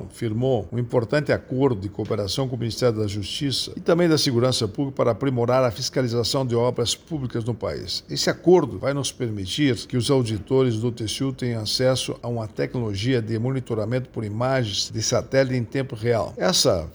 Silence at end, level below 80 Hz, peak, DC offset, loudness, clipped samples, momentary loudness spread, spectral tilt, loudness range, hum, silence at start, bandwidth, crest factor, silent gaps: 0 s; -50 dBFS; -6 dBFS; under 0.1%; -23 LUFS; under 0.1%; 8 LU; -5 dB/octave; 3 LU; none; 0 s; over 20 kHz; 18 dB; none